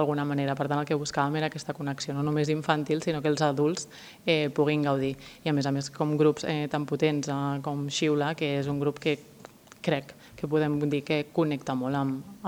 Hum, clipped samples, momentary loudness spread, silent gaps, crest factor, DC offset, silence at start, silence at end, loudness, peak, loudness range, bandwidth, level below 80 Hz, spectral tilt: none; under 0.1%; 7 LU; none; 20 dB; under 0.1%; 0 s; 0 s; -28 LUFS; -8 dBFS; 3 LU; 16.5 kHz; -64 dBFS; -6 dB/octave